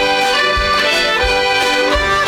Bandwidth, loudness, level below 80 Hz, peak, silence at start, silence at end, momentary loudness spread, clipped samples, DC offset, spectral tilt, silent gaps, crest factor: 16.5 kHz; -13 LUFS; -28 dBFS; -6 dBFS; 0 s; 0 s; 1 LU; under 0.1%; under 0.1%; -2.5 dB/octave; none; 8 dB